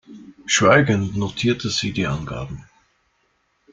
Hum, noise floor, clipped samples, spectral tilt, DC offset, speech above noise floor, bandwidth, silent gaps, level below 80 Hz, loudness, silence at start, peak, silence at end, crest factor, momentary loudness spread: none; -66 dBFS; under 0.1%; -4.5 dB/octave; under 0.1%; 47 dB; 9.6 kHz; none; -48 dBFS; -19 LUFS; 0.1 s; -2 dBFS; 1.1 s; 20 dB; 19 LU